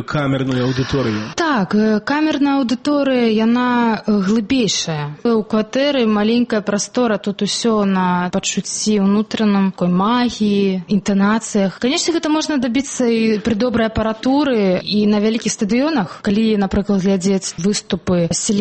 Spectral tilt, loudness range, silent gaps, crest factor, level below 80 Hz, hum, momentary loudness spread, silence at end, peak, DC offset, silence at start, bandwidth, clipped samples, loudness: -5 dB/octave; 1 LU; none; 10 dB; -44 dBFS; none; 4 LU; 0 s; -6 dBFS; under 0.1%; 0 s; 8.8 kHz; under 0.1%; -17 LUFS